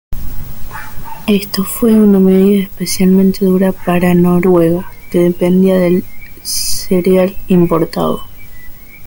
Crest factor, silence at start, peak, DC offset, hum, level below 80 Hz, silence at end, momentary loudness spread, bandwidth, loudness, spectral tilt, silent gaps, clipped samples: 12 dB; 0.1 s; 0 dBFS; under 0.1%; none; -32 dBFS; 0 s; 19 LU; 17 kHz; -12 LUFS; -6.5 dB/octave; none; under 0.1%